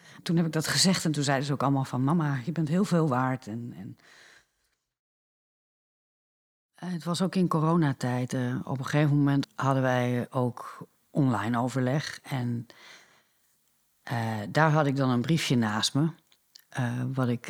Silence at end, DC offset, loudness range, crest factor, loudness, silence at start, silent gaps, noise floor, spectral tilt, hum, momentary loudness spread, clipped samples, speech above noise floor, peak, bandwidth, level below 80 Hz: 0 s; under 0.1%; 6 LU; 22 dB; -27 LUFS; 0.1 s; 4.99-6.69 s; -77 dBFS; -5.5 dB/octave; none; 13 LU; under 0.1%; 50 dB; -6 dBFS; 16.5 kHz; -72 dBFS